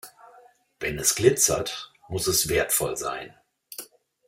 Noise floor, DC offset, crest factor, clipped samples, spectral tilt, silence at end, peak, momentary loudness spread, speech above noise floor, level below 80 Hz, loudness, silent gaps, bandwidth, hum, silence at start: -55 dBFS; under 0.1%; 22 dB; under 0.1%; -2.5 dB/octave; 0.45 s; -4 dBFS; 20 LU; 31 dB; -52 dBFS; -23 LUFS; none; 16.5 kHz; none; 0.05 s